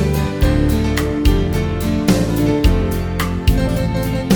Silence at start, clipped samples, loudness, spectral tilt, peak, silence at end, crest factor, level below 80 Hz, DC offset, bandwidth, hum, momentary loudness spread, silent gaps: 0 s; under 0.1%; -17 LUFS; -6.5 dB/octave; 0 dBFS; 0 s; 14 dB; -20 dBFS; under 0.1%; over 20 kHz; none; 4 LU; none